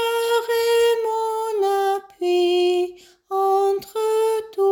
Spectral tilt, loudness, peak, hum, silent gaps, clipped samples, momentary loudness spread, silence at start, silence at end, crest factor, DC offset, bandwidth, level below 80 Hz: -2 dB/octave; -21 LUFS; -8 dBFS; none; none; under 0.1%; 6 LU; 0 s; 0 s; 12 dB; under 0.1%; 17 kHz; -66 dBFS